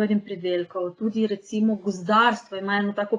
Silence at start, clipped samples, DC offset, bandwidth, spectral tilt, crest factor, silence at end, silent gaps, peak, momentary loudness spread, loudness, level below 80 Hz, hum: 0 s; under 0.1%; under 0.1%; 9.4 kHz; -6 dB/octave; 18 dB; 0 s; none; -6 dBFS; 9 LU; -24 LUFS; -72 dBFS; none